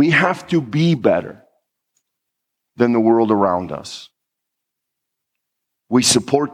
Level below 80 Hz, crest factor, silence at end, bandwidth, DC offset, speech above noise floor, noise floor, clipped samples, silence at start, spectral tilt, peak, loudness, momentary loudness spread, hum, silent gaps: -62 dBFS; 18 dB; 0 s; 15.5 kHz; under 0.1%; 63 dB; -80 dBFS; under 0.1%; 0 s; -4.5 dB/octave; -2 dBFS; -16 LUFS; 15 LU; none; none